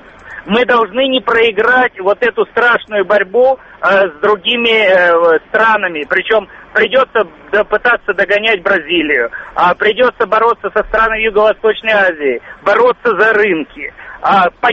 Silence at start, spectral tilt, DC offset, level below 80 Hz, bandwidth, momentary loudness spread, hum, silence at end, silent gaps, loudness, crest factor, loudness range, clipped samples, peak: 0.25 s; -5 dB/octave; under 0.1%; -44 dBFS; 7.6 kHz; 6 LU; none; 0 s; none; -12 LUFS; 12 dB; 2 LU; under 0.1%; 0 dBFS